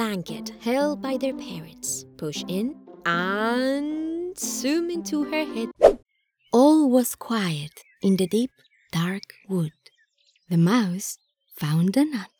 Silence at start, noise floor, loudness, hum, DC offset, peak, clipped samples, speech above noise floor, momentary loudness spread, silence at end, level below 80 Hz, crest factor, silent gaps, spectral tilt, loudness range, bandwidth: 0 s; -65 dBFS; -24 LUFS; none; under 0.1%; -2 dBFS; under 0.1%; 41 dB; 13 LU; 0.15 s; -54 dBFS; 22 dB; none; -5.5 dB/octave; 6 LU; over 20 kHz